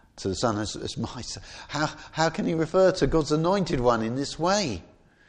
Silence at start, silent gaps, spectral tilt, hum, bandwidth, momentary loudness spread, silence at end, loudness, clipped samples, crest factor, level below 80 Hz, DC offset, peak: 0.15 s; none; -5 dB/octave; none; 10.5 kHz; 12 LU; 0.45 s; -26 LUFS; under 0.1%; 18 dB; -44 dBFS; under 0.1%; -8 dBFS